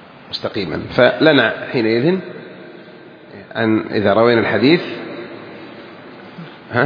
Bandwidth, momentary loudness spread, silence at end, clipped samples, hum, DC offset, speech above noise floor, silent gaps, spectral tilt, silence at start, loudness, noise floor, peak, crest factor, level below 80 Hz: 5.2 kHz; 24 LU; 0 s; under 0.1%; none; under 0.1%; 24 dB; none; -8 dB/octave; 0.3 s; -16 LUFS; -39 dBFS; 0 dBFS; 18 dB; -54 dBFS